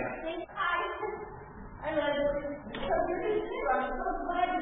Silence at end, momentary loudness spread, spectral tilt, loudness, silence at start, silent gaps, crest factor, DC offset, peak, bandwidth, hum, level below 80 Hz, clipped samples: 0 s; 10 LU; 0 dB/octave; -33 LUFS; 0 s; none; 16 dB; under 0.1%; -16 dBFS; 3.9 kHz; none; -50 dBFS; under 0.1%